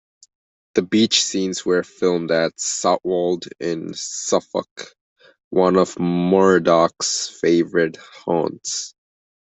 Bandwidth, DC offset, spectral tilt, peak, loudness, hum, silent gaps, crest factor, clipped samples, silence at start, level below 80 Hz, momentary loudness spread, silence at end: 8.4 kHz; under 0.1%; -4 dB/octave; -2 dBFS; -19 LUFS; none; 4.71-4.76 s, 5.01-5.16 s, 5.44-5.51 s; 18 dB; under 0.1%; 0.75 s; -62 dBFS; 11 LU; 0.65 s